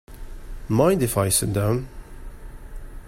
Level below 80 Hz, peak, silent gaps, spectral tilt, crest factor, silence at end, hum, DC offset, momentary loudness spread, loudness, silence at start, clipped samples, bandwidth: -38 dBFS; -4 dBFS; none; -5 dB/octave; 20 dB; 0 s; none; under 0.1%; 24 LU; -21 LUFS; 0.1 s; under 0.1%; 16.5 kHz